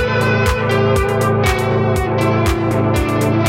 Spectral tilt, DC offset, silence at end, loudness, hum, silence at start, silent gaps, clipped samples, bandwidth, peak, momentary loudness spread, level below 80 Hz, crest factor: -6 dB/octave; under 0.1%; 0 s; -15 LUFS; none; 0 s; none; under 0.1%; 16.5 kHz; -2 dBFS; 2 LU; -28 dBFS; 12 dB